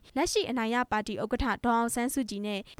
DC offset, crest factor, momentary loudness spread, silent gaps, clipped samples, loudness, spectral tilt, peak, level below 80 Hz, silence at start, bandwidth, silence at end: under 0.1%; 16 dB; 5 LU; none; under 0.1%; -30 LUFS; -3.5 dB/octave; -14 dBFS; -48 dBFS; 0.05 s; 16 kHz; 0.05 s